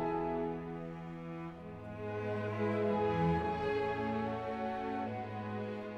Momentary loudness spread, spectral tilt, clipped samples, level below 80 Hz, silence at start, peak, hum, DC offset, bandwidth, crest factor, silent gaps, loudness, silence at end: 12 LU; -8.5 dB/octave; under 0.1%; -58 dBFS; 0 s; -20 dBFS; none; under 0.1%; 8.4 kHz; 16 dB; none; -37 LUFS; 0 s